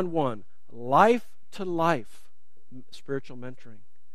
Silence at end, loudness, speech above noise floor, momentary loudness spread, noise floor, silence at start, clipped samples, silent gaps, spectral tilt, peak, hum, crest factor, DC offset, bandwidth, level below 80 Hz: 0.4 s; -26 LUFS; 32 dB; 24 LU; -59 dBFS; 0 s; under 0.1%; none; -6.5 dB/octave; -4 dBFS; none; 24 dB; 2%; 14.5 kHz; -68 dBFS